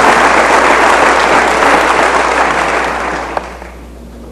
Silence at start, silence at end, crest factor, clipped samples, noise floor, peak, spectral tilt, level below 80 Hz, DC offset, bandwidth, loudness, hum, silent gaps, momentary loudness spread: 0 s; 0 s; 10 dB; 0.5%; -30 dBFS; 0 dBFS; -3 dB/octave; -32 dBFS; under 0.1%; 14 kHz; -9 LUFS; none; none; 12 LU